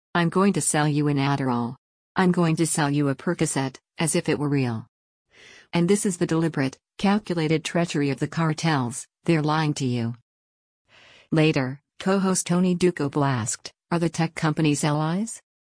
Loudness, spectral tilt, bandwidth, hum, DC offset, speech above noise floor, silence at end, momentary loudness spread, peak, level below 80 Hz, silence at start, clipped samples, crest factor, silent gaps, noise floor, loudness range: -24 LUFS; -5.5 dB/octave; 10.5 kHz; none; under 0.1%; over 67 dB; 0.25 s; 8 LU; -8 dBFS; -60 dBFS; 0.15 s; under 0.1%; 14 dB; 1.78-2.15 s, 4.88-5.25 s, 10.22-10.85 s; under -90 dBFS; 2 LU